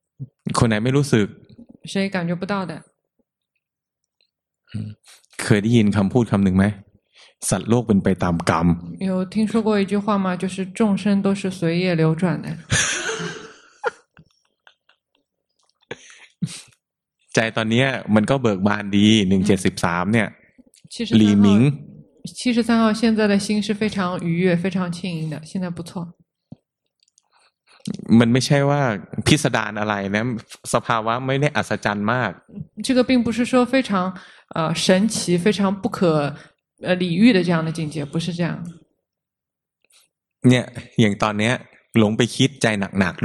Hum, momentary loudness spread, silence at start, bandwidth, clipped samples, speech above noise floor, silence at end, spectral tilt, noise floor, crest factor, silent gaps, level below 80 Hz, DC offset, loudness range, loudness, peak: none; 15 LU; 0.2 s; 12.5 kHz; under 0.1%; 67 dB; 0 s; -5.5 dB/octave; -86 dBFS; 20 dB; none; -52 dBFS; under 0.1%; 9 LU; -20 LUFS; -2 dBFS